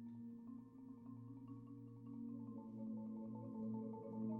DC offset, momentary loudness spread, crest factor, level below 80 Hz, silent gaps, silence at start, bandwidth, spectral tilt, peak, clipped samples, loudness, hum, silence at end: under 0.1%; 9 LU; 14 dB; -82 dBFS; none; 0 s; 2.4 kHz; -12.5 dB/octave; -36 dBFS; under 0.1%; -52 LUFS; none; 0 s